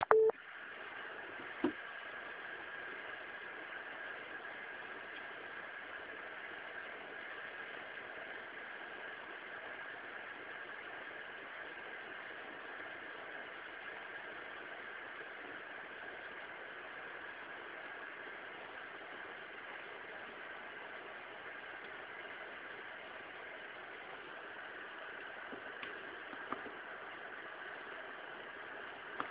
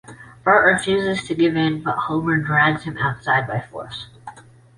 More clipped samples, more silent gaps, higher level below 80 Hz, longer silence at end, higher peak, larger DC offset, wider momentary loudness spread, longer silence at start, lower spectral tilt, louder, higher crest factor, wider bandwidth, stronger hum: neither; neither; second, -82 dBFS vs -52 dBFS; second, 0 s vs 0.35 s; second, -8 dBFS vs -2 dBFS; neither; second, 3 LU vs 17 LU; about the same, 0 s vs 0.1 s; second, -0.5 dB/octave vs -5.5 dB/octave; second, -46 LUFS vs -19 LUFS; first, 36 dB vs 18 dB; second, 4 kHz vs 11.5 kHz; neither